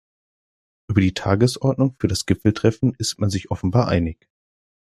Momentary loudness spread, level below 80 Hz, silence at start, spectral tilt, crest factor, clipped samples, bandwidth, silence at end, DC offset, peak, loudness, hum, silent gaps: 5 LU; -46 dBFS; 0.9 s; -6 dB/octave; 20 dB; under 0.1%; 13.5 kHz; 0.8 s; under 0.1%; -2 dBFS; -21 LUFS; none; none